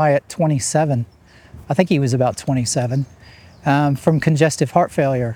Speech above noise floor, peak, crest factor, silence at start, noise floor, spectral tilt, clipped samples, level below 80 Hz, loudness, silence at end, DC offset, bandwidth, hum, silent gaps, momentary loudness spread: 25 dB; 0 dBFS; 18 dB; 0 s; -42 dBFS; -6 dB/octave; under 0.1%; -52 dBFS; -18 LUFS; 0 s; under 0.1%; 15 kHz; none; none; 7 LU